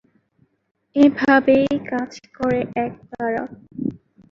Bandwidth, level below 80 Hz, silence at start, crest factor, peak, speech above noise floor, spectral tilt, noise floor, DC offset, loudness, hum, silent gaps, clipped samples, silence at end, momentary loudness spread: 7.2 kHz; -56 dBFS; 0.95 s; 18 dB; -2 dBFS; 44 dB; -6.5 dB/octave; -63 dBFS; under 0.1%; -20 LUFS; none; none; under 0.1%; 0.35 s; 14 LU